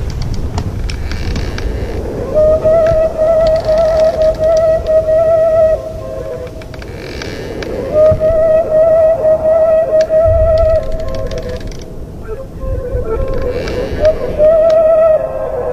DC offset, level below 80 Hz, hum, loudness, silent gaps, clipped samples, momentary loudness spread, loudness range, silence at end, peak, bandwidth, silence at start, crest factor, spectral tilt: under 0.1%; -24 dBFS; none; -12 LUFS; none; under 0.1%; 14 LU; 6 LU; 0 s; 0 dBFS; 8.8 kHz; 0 s; 12 dB; -7 dB/octave